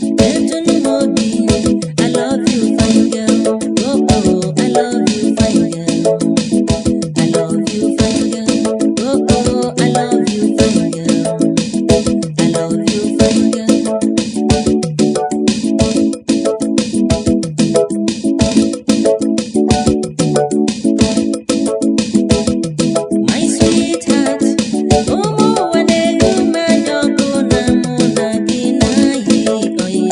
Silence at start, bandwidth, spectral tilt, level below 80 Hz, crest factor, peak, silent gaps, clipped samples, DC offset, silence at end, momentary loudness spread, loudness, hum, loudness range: 0 s; 11 kHz; -5 dB/octave; -34 dBFS; 12 dB; 0 dBFS; none; under 0.1%; under 0.1%; 0 s; 4 LU; -13 LUFS; none; 1 LU